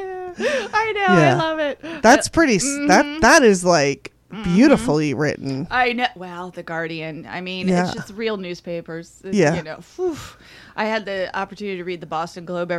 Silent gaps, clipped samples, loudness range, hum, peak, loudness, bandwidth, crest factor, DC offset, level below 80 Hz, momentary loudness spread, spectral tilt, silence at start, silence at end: none; under 0.1%; 9 LU; none; -2 dBFS; -19 LUFS; 14.5 kHz; 18 dB; under 0.1%; -46 dBFS; 16 LU; -4.5 dB/octave; 0 s; 0 s